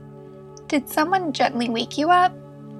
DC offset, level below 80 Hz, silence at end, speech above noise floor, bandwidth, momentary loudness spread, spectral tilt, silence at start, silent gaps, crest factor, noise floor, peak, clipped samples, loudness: under 0.1%; -60 dBFS; 0 s; 21 dB; 14 kHz; 24 LU; -4 dB/octave; 0 s; none; 18 dB; -41 dBFS; -4 dBFS; under 0.1%; -21 LUFS